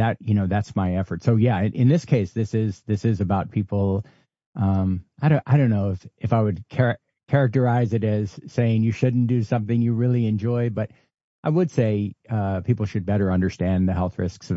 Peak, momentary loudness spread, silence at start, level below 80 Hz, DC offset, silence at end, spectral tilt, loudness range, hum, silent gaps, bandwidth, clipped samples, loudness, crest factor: -6 dBFS; 7 LU; 0 s; -52 dBFS; under 0.1%; 0 s; -9 dB/octave; 2 LU; none; 4.46-4.53 s, 11.24-11.43 s; 7.6 kHz; under 0.1%; -23 LUFS; 16 dB